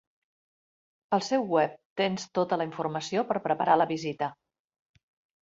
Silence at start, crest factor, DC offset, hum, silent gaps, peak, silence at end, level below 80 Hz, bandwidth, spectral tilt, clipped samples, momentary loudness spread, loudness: 1.1 s; 20 dB; under 0.1%; none; 1.85-1.96 s; -10 dBFS; 1.1 s; -74 dBFS; 7.8 kHz; -5 dB/octave; under 0.1%; 8 LU; -28 LUFS